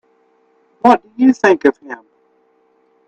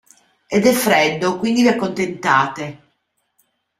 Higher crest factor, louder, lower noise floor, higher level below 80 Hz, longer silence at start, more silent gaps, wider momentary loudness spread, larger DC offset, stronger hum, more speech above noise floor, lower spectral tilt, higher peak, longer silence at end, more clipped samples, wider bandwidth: about the same, 16 dB vs 18 dB; first, -13 LUFS vs -17 LUFS; second, -57 dBFS vs -69 dBFS; about the same, -62 dBFS vs -58 dBFS; first, 0.85 s vs 0.5 s; neither; first, 20 LU vs 8 LU; neither; neither; second, 44 dB vs 52 dB; about the same, -5.5 dB/octave vs -4.5 dB/octave; about the same, 0 dBFS vs 0 dBFS; about the same, 1.15 s vs 1.05 s; neither; second, 8 kHz vs 16 kHz